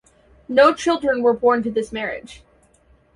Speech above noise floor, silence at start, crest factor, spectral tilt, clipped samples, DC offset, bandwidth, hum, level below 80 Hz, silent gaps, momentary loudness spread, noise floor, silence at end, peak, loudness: 38 dB; 0.5 s; 18 dB; -4.5 dB/octave; under 0.1%; under 0.1%; 11.5 kHz; none; -54 dBFS; none; 12 LU; -56 dBFS; 0.8 s; -2 dBFS; -19 LUFS